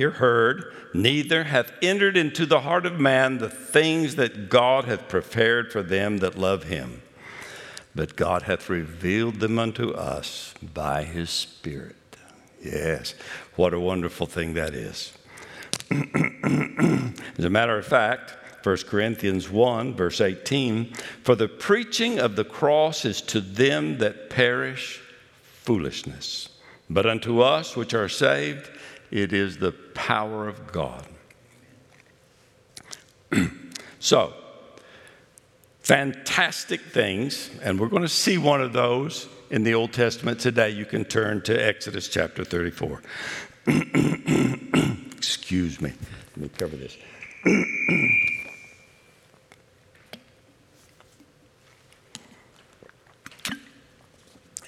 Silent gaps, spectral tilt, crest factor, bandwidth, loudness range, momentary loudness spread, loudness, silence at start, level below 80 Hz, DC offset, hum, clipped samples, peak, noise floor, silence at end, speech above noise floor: none; -4.5 dB/octave; 24 dB; 16 kHz; 7 LU; 16 LU; -24 LUFS; 0 s; -56 dBFS; under 0.1%; none; under 0.1%; 0 dBFS; -58 dBFS; 0.1 s; 34 dB